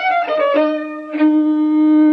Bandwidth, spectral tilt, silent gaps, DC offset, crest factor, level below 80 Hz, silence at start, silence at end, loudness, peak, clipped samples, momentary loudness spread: 5.6 kHz; -6 dB/octave; none; under 0.1%; 10 dB; -78 dBFS; 0 s; 0 s; -15 LUFS; -4 dBFS; under 0.1%; 8 LU